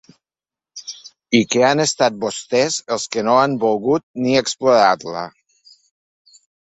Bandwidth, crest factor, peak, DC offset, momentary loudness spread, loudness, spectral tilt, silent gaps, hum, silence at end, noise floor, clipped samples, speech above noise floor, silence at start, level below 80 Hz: 8.4 kHz; 18 dB; 0 dBFS; under 0.1%; 18 LU; -17 LUFS; -3.5 dB/octave; 4.03-4.14 s; none; 1.4 s; under -90 dBFS; under 0.1%; over 73 dB; 0.75 s; -60 dBFS